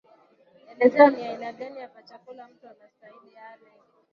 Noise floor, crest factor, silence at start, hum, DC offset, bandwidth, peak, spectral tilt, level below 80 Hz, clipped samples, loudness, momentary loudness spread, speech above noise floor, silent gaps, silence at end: -59 dBFS; 24 dB; 0.8 s; none; under 0.1%; 6.2 kHz; -2 dBFS; -6.5 dB/octave; -74 dBFS; under 0.1%; -20 LUFS; 27 LU; 34 dB; none; 1.7 s